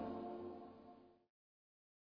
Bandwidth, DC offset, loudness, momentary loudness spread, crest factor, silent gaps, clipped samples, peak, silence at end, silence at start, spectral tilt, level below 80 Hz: 5.2 kHz; under 0.1%; -51 LUFS; 16 LU; 18 dB; none; under 0.1%; -36 dBFS; 1 s; 0 s; -6.5 dB/octave; -82 dBFS